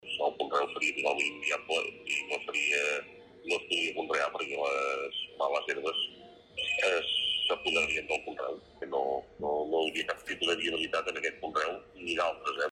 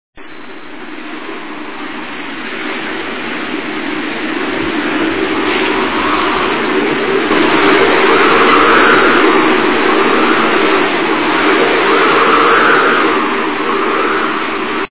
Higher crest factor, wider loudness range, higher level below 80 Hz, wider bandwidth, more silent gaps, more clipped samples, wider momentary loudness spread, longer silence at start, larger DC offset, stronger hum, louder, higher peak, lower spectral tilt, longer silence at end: first, 18 dB vs 12 dB; second, 2 LU vs 12 LU; second, -66 dBFS vs -44 dBFS; first, 14.5 kHz vs 4 kHz; neither; neither; second, 8 LU vs 16 LU; about the same, 0.05 s vs 0.15 s; second, under 0.1% vs 3%; neither; second, -31 LUFS vs -11 LUFS; second, -14 dBFS vs 0 dBFS; second, -1.5 dB/octave vs -7.5 dB/octave; about the same, 0 s vs 0 s